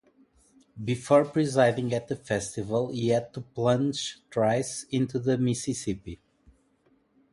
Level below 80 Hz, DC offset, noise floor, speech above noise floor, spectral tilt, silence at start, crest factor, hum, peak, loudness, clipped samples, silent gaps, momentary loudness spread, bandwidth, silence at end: -58 dBFS; under 0.1%; -67 dBFS; 40 dB; -5.5 dB/octave; 0.75 s; 20 dB; none; -8 dBFS; -27 LUFS; under 0.1%; none; 11 LU; 11.5 kHz; 1.15 s